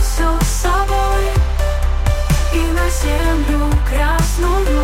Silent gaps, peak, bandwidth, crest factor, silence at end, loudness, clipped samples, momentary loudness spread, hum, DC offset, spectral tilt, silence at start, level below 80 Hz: none; -4 dBFS; 16.5 kHz; 10 dB; 0 s; -17 LUFS; under 0.1%; 2 LU; none; under 0.1%; -5 dB/octave; 0 s; -16 dBFS